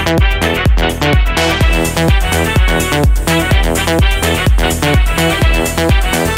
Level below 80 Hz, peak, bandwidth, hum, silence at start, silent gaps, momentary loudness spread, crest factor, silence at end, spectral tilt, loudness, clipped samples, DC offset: -14 dBFS; 0 dBFS; 16.5 kHz; none; 0 s; none; 1 LU; 10 dB; 0 s; -4.5 dB/octave; -12 LUFS; under 0.1%; under 0.1%